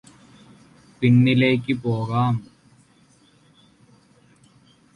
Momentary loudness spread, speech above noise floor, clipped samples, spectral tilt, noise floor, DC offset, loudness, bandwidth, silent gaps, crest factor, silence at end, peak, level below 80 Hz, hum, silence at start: 8 LU; 38 dB; under 0.1%; -8 dB/octave; -57 dBFS; under 0.1%; -20 LUFS; 9.8 kHz; none; 18 dB; 2.55 s; -6 dBFS; -58 dBFS; none; 1 s